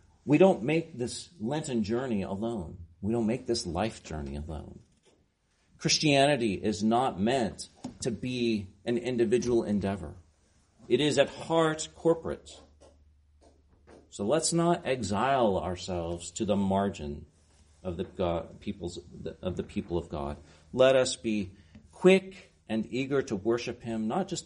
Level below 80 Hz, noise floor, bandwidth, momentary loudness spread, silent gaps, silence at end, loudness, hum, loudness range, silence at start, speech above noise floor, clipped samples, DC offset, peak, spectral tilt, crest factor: -54 dBFS; -70 dBFS; 10.5 kHz; 16 LU; none; 0 s; -29 LUFS; none; 6 LU; 0.25 s; 41 dB; under 0.1%; under 0.1%; -8 dBFS; -5 dB/octave; 22 dB